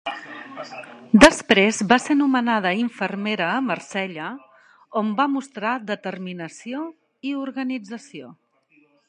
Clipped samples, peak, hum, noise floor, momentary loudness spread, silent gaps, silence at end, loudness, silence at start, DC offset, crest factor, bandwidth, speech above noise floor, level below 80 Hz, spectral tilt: under 0.1%; 0 dBFS; none; -60 dBFS; 19 LU; none; 0.75 s; -21 LUFS; 0.05 s; under 0.1%; 22 dB; 11.5 kHz; 39 dB; -50 dBFS; -4 dB/octave